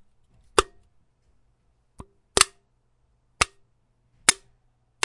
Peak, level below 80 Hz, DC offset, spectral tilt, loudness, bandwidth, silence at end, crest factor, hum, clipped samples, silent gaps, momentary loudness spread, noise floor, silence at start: 0 dBFS; -48 dBFS; under 0.1%; -0.5 dB/octave; -23 LUFS; 12 kHz; 0.7 s; 30 dB; none; under 0.1%; none; 9 LU; -67 dBFS; 0.55 s